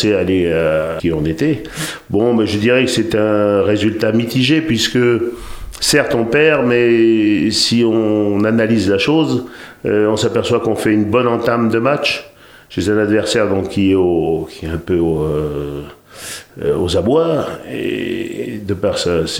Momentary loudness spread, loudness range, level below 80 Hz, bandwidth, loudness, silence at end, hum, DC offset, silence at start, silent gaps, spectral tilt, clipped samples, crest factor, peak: 11 LU; 5 LU; -40 dBFS; 16.5 kHz; -15 LUFS; 0 s; none; under 0.1%; 0 s; none; -5 dB/octave; under 0.1%; 14 dB; 0 dBFS